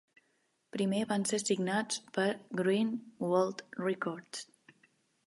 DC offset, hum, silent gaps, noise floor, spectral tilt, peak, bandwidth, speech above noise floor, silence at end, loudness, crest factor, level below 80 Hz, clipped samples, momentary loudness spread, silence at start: under 0.1%; none; none; -76 dBFS; -4.5 dB/octave; -16 dBFS; 11.5 kHz; 43 dB; 0.85 s; -33 LUFS; 18 dB; -82 dBFS; under 0.1%; 12 LU; 0.75 s